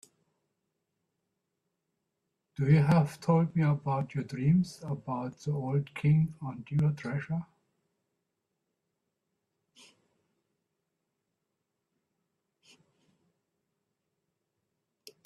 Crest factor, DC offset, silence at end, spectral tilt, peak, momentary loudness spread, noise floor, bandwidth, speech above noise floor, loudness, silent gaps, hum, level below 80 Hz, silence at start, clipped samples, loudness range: 20 dB; under 0.1%; 7.8 s; -8.5 dB/octave; -12 dBFS; 11 LU; -84 dBFS; 11 kHz; 56 dB; -30 LUFS; none; none; -66 dBFS; 2.6 s; under 0.1%; 9 LU